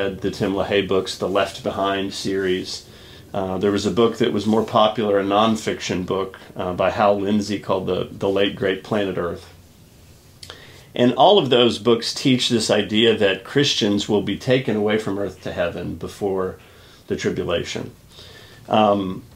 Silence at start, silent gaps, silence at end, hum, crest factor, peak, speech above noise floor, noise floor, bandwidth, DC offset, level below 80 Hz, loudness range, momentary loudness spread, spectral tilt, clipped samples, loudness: 0 s; none; 0.1 s; none; 20 dB; -2 dBFS; 28 dB; -48 dBFS; 16 kHz; under 0.1%; -52 dBFS; 7 LU; 12 LU; -5 dB/octave; under 0.1%; -20 LUFS